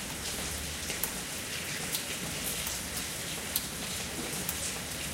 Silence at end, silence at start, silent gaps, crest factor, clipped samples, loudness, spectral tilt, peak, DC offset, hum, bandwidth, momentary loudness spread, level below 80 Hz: 0 s; 0 s; none; 28 dB; under 0.1%; -33 LUFS; -1.5 dB/octave; -8 dBFS; under 0.1%; none; 17 kHz; 3 LU; -50 dBFS